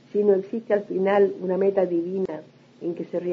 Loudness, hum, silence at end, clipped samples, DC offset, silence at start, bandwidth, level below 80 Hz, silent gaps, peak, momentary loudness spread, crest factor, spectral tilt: -24 LUFS; none; 0 s; under 0.1%; under 0.1%; 0.15 s; 5.8 kHz; -74 dBFS; none; -8 dBFS; 11 LU; 16 dB; -9 dB/octave